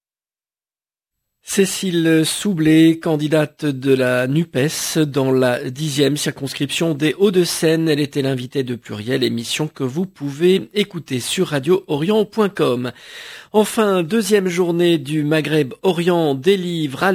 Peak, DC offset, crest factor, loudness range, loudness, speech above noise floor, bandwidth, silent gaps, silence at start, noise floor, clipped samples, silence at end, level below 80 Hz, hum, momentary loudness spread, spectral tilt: -2 dBFS; under 0.1%; 16 dB; 3 LU; -18 LUFS; over 73 dB; 16 kHz; none; 1.45 s; under -90 dBFS; under 0.1%; 0 s; -60 dBFS; none; 7 LU; -5 dB/octave